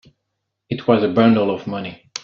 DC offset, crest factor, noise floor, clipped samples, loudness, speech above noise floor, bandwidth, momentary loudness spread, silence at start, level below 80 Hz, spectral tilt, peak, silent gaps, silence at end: under 0.1%; 18 dB; -77 dBFS; under 0.1%; -18 LUFS; 60 dB; 7.2 kHz; 15 LU; 0.7 s; -58 dBFS; -5.5 dB/octave; -2 dBFS; none; 0.05 s